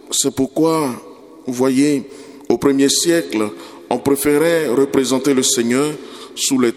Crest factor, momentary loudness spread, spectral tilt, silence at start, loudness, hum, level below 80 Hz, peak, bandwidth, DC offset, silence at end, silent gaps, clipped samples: 16 dB; 13 LU; -3.5 dB/octave; 0.05 s; -16 LUFS; none; -54 dBFS; 0 dBFS; 17 kHz; under 0.1%; 0 s; none; under 0.1%